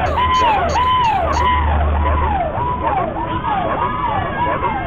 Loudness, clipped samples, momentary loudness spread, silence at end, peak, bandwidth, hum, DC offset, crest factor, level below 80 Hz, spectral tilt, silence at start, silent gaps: -17 LUFS; under 0.1%; 5 LU; 0 s; -6 dBFS; 7.4 kHz; none; under 0.1%; 10 dB; -24 dBFS; -6 dB/octave; 0 s; none